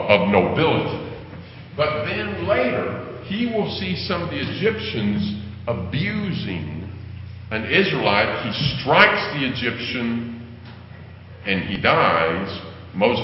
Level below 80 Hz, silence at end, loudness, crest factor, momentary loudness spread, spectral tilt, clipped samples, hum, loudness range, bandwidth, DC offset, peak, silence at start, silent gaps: -44 dBFS; 0 s; -21 LUFS; 22 dB; 19 LU; -9.5 dB/octave; under 0.1%; none; 5 LU; 5.8 kHz; under 0.1%; 0 dBFS; 0 s; none